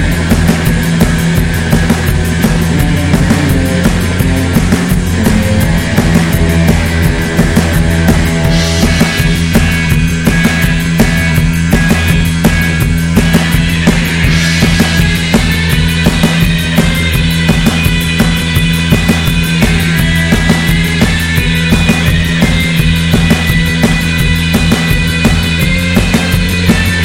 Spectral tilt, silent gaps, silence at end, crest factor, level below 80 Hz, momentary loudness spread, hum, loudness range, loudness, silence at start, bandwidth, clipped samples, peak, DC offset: -5 dB/octave; none; 0 s; 10 dB; -18 dBFS; 2 LU; none; 1 LU; -10 LUFS; 0 s; 17 kHz; 0.2%; 0 dBFS; under 0.1%